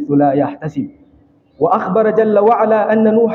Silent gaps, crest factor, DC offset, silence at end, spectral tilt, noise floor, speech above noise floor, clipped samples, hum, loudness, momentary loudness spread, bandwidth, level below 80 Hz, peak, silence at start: none; 12 dB; under 0.1%; 0 s; -9.5 dB/octave; -50 dBFS; 37 dB; under 0.1%; none; -14 LUFS; 12 LU; 4.2 kHz; -60 dBFS; -2 dBFS; 0 s